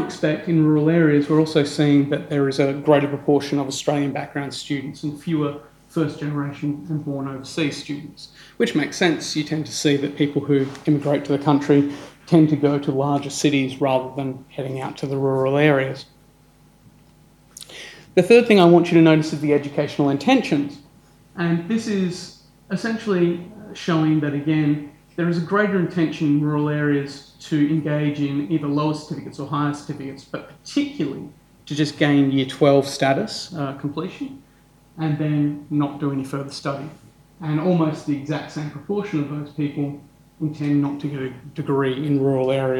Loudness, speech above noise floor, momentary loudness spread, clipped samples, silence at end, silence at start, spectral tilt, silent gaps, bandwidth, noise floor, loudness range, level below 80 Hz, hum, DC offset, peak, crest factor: -21 LUFS; 33 dB; 14 LU; under 0.1%; 0 s; 0 s; -6.5 dB/octave; none; 12.5 kHz; -53 dBFS; 8 LU; -60 dBFS; none; under 0.1%; 0 dBFS; 20 dB